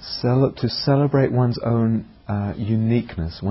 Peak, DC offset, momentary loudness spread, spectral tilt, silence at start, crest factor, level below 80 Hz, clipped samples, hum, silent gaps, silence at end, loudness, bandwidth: -6 dBFS; under 0.1%; 8 LU; -11 dB/octave; 0 s; 14 dB; -42 dBFS; under 0.1%; none; none; 0 s; -21 LUFS; 5.8 kHz